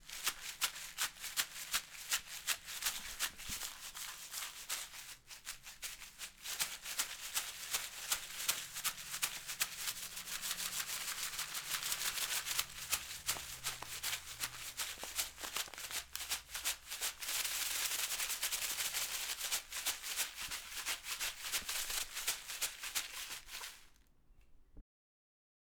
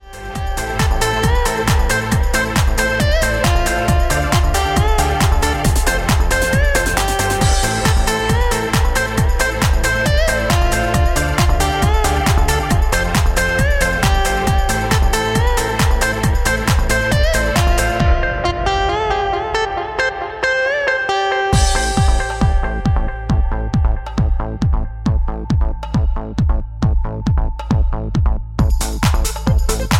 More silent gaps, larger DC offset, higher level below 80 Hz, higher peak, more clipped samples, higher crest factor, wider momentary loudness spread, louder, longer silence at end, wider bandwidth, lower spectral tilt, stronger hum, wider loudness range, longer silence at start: neither; neither; second, -64 dBFS vs -18 dBFS; second, -16 dBFS vs 0 dBFS; neither; first, 26 dB vs 14 dB; first, 8 LU vs 4 LU; second, -39 LUFS vs -17 LUFS; first, 1 s vs 0 s; first, over 20 kHz vs 16.5 kHz; second, 1.5 dB/octave vs -4.5 dB/octave; neither; about the same, 5 LU vs 4 LU; about the same, 0 s vs 0.05 s